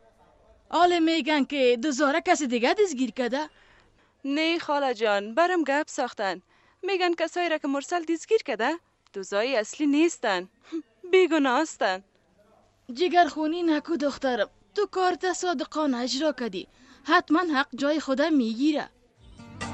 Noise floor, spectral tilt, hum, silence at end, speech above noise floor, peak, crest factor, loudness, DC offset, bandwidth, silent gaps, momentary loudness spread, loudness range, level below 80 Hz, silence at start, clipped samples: -61 dBFS; -3 dB/octave; none; 0 s; 36 dB; -8 dBFS; 18 dB; -25 LUFS; under 0.1%; 8.8 kHz; none; 11 LU; 3 LU; -66 dBFS; 0.7 s; under 0.1%